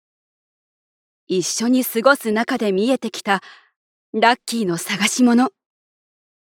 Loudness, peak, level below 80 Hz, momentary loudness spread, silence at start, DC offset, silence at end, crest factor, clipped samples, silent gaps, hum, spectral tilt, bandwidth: -19 LUFS; 0 dBFS; -72 dBFS; 7 LU; 1.3 s; under 0.1%; 1.05 s; 20 dB; under 0.1%; 3.76-4.13 s; none; -3.5 dB/octave; 18 kHz